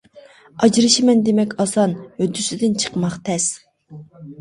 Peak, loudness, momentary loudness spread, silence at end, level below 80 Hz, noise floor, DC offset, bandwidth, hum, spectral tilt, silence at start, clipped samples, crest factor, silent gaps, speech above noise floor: -2 dBFS; -18 LUFS; 10 LU; 0.05 s; -58 dBFS; -46 dBFS; under 0.1%; 11.5 kHz; none; -4 dB/octave; 0.15 s; under 0.1%; 18 dB; none; 29 dB